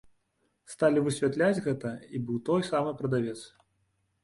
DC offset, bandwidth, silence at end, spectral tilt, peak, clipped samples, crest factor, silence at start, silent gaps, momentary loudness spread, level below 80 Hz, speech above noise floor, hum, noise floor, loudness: under 0.1%; 11.5 kHz; 0.75 s; -6.5 dB/octave; -12 dBFS; under 0.1%; 18 dB; 0.7 s; none; 11 LU; -66 dBFS; 47 dB; none; -75 dBFS; -29 LUFS